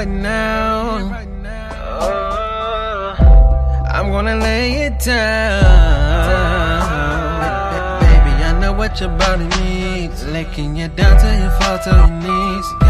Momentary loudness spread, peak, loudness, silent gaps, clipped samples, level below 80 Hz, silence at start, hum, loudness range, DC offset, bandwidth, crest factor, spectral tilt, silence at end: 11 LU; 0 dBFS; -16 LUFS; none; under 0.1%; -14 dBFS; 0 s; none; 3 LU; under 0.1%; 13.5 kHz; 12 dB; -6 dB/octave; 0 s